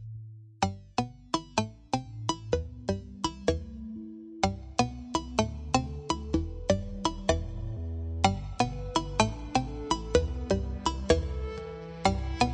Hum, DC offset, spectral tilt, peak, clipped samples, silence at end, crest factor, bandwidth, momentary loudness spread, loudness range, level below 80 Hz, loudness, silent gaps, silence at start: none; under 0.1%; -5 dB/octave; -8 dBFS; under 0.1%; 0 s; 22 dB; 10.5 kHz; 9 LU; 4 LU; -40 dBFS; -31 LUFS; none; 0 s